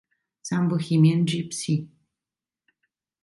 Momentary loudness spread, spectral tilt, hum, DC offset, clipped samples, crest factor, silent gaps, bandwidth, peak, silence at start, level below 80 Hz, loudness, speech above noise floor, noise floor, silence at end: 9 LU; -6 dB/octave; none; under 0.1%; under 0.1%; 18 dB; none; 11.5 kHz; -8 dBFS; 0.45 s; -66 dBFS; -24 LUFS; over 68 dB; under -90 dBFS; 1.4 s